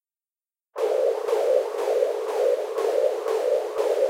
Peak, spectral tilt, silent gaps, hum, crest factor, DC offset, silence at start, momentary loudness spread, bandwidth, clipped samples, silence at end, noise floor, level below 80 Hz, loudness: -10 dBFS; -1.5 dB/octave; none; none; 16 dB; under 0.1%; 0.75 s; 3 LU; 16 kHz; under 0.1%; 0 s; under -90 dBFS; -84 dBFS; -24 LUFS